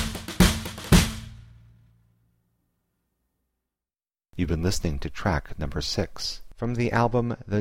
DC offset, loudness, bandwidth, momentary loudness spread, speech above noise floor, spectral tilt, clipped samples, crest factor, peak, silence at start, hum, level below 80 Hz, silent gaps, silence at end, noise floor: under 0.1%; -26 LUFS; 16.5 kHz; 12 LU; over 64 dB; -5 dB/octave; under 0.1%; 22 dB; -4 dBFS; 0 s; none; -34 dBFS; none; 0 s; under -90 dBFS